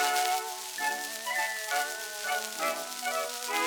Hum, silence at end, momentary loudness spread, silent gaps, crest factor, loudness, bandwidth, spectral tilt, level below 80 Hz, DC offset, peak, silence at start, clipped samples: none; 0 s; 4 LU; none; 20 dB; -31 LUFS; over 20 kHz; 1.5 dB/octave; -78 dBFS; under 0.1%; -12 dBFS; 0 s; under 0.1%